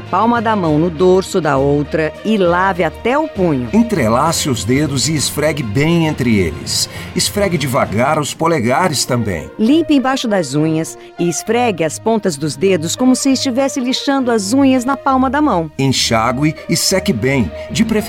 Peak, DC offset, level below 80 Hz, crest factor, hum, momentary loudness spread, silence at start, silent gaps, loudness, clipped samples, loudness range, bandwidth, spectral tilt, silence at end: -2 dBFS; under 0.1%; -38 dBFS; 12 dB; none; 4 LU; 0 s; none; -15 LUFS; under 0.1%; 2 LU; 17 kHz; -4.5 dB/octave; 0 s